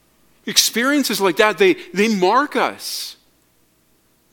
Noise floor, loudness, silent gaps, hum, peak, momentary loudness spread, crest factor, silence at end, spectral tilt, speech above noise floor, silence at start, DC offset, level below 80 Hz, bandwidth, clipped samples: -59 dBFS; -17 LUFS; none; none; 0 dBFS; 12 LU; 20 dB; 1.2 s; -2.5 dB/octave; 42 dB; 0.45 s; under 0.1%; -64 dBFS; 17.5 kHz; under 0.1%